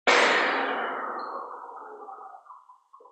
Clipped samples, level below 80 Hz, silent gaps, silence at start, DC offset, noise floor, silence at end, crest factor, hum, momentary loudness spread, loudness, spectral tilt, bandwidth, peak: under 0.1%; -82 dBFS; none; 0.05 s; under 0.1%; -54 dBFS; 0.4 s; 20 dB; none; 23 LU; -25 LUFS; -1 dB/octave; 8.8 kHz; -8 dBFS